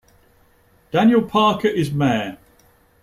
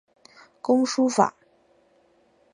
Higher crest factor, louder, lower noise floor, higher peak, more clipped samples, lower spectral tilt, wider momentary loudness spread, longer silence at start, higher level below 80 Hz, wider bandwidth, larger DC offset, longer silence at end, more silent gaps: second, 16 dB vs 24 dB; first, -18 LUFS vs -23 LUFS; second, -56 dBFS vs -62 dBFS; about the same, -4 dBFS vs -4 dBFS; neither; first, -6.5 dB/octave vs -4.5 dB/octave; first, 8 LU vs 5 LU; first, 0.95 s vs 0.65 s; first, -54 dBFS vs -80 dBFS; first, 14.5 kHz vs 10.5 kHz; neither; second, 0.7 s vs 1.25 s; neither